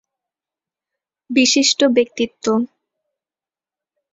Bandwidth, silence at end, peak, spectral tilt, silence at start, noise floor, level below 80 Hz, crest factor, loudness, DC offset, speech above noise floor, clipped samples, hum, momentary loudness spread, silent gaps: 8 kHz; 1.45 s; -2 dBFS; -2 dB/octave; 1.3 s; under -90 dBFS; -66 dBFS; 18 dB; -16 LUFS; under 0.1%; over 74 dB; under 0.1%; none; 9 LU; none